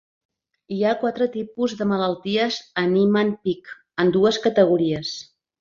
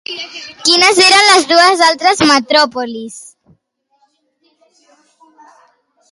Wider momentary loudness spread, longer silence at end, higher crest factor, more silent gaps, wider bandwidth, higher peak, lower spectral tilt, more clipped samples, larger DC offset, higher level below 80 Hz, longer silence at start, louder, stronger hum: second, 10 LU vs 18 LU; second, 0.4 s vs 2.9 s; about the same, 18 dB vs 14 dB; neither; second, 7.6 kHz vs 12 kHz; second, -4 dBFS vs 0 dBFS; first, -6 dB/octave vs -1 dB/octave; neither; neither; about the same, -60 dBFS vs -56 dBFS; first, 0.7 s vs 0.1 s; second, -21 LUFS vs -9 LUFS; neither